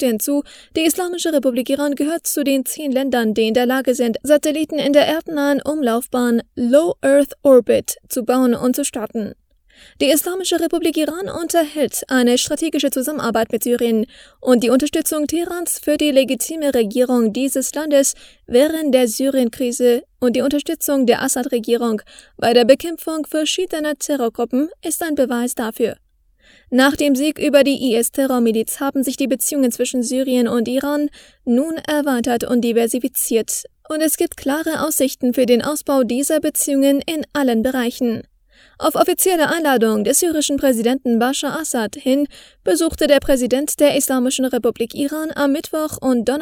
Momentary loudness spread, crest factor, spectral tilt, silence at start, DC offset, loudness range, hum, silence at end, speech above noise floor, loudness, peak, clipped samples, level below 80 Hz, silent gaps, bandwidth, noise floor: 7 LU; 18 dB; -3 dB/octave; 0 s; under 0.1%; 2 LU; none; 0 s; 37 dB; -18 LUFS; 0 dBFS; under 0.1%; -50 dBFS; none; over 20 kHz; -54 dBFS